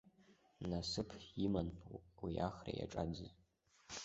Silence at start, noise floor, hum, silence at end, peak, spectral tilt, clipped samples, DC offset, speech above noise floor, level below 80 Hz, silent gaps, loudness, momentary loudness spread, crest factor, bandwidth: 0.05 s; -71 dBFS; none; 0 s; -24 dBFS; -6 dB/octave; under 0.1%; under 0.1%; 27 dB; -60 dBFS; none; -44 LUFS; 12 LU; 20 dB; 8 kHz